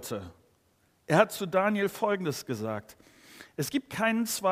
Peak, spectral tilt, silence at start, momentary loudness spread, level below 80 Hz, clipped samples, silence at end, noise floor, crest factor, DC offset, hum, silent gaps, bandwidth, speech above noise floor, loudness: -6 dBFS; -4.5 dB/octave; 0 s; 15 LU; -70 dBFS; under 0.1%; 0 s; -68 dBFS; 24 dB; under 0.1%; none; none; 15.5 kHz; 40 dB; -29 LUFS